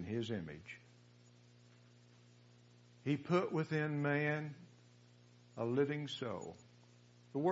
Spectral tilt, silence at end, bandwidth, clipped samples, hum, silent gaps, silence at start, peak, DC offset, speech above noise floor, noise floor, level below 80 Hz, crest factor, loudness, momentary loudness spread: -5.5 dB/octave; 0 s; 7.6 kHz; under 0.1%; 60 Hz at -65 dBFS; none; 0 s; -20 dBFS; under 0.1%; 26 dB; -64 dBFS; -80 dBFS; 22 dB; -39 LUFS; 18 LU